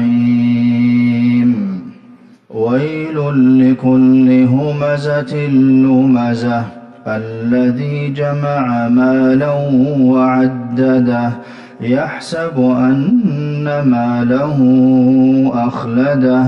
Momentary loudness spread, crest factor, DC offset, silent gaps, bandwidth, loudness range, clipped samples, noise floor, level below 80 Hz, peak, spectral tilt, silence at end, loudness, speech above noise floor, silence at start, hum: 10 LU; 10 dB; under 0.1%; none; 6.2 kHz; 3 LU; under 0.1%; -41 dBFS; -52 dBFS; -2 dBFS; -9 dB/octave; 0 s; -13 LUFS; 29 dB; 0 s; none